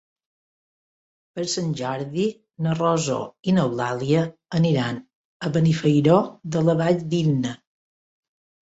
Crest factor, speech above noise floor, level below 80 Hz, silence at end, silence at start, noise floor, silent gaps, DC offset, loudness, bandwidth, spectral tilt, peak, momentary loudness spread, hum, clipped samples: 18 dB; over 69 dB; -60 dBFS; 1.1 s; 1.35 s; under -90 dBFS; 5.15-5.40 s; under 0.1%; -22 LUFS; 8 kHz; -6.5 dB/octave; -6 dBFS; 10 LU; none; under 0.1%